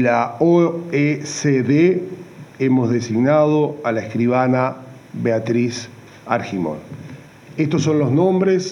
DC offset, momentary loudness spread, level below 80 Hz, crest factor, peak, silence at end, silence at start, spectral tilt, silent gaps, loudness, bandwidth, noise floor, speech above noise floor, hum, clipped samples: under 0.1%; 19 LU; -64 dBFS; 16 dB; -2 dBFS; 0 s; 0 s; -6.5 dB/octave; none; -18 LUFS; 10.5 kHz; -39 dBFS; 21 dB; none; under 0.1%